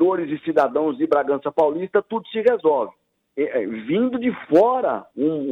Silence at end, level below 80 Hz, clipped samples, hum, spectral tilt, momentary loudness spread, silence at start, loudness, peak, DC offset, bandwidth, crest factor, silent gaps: 0 s; -66 dBFS; under 0.1%; none; -8 dB/octave; 7 LU; 0 s; -21 LUFS; -4 dBFS; under 0.1%; 6.6 kHz; 16 dB; none